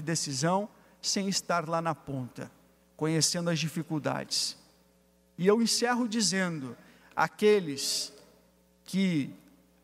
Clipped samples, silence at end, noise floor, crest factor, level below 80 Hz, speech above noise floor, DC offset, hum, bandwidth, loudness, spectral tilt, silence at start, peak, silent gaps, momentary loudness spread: under 0.1%; 0.45 s; -65 dBFS; 20 dB; -70 dBFS; 36 dB; under 0.1%; none; 16 kHz; -29 LUFS; -3.5 dB/octave; 0 s; -12 dBFS; none; 14 LU